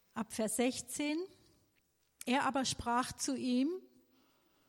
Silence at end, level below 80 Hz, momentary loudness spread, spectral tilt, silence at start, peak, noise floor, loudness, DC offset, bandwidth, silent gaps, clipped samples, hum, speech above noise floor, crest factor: 0.85 s; -66 dBFS; 9 LU; -3 dB/octave; 0.15 s; -22 dBFS; -76 dBFS; -36 LUFS; under 0.1%; 16.5 kHz; none; under 0.1%; none; 41 dB; 16 dB